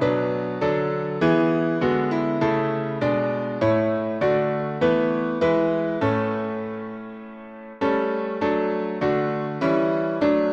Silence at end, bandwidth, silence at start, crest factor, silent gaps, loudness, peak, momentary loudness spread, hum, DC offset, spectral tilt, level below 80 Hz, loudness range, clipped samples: 0 s; 7.6 kHz; 0 s; 14 dB; none; -23 LUFS; -8 dBFS; 8 LU; none; under 0.1%; -8.5 dB/octave; -56 dBFS; 3 LU; under 0.1%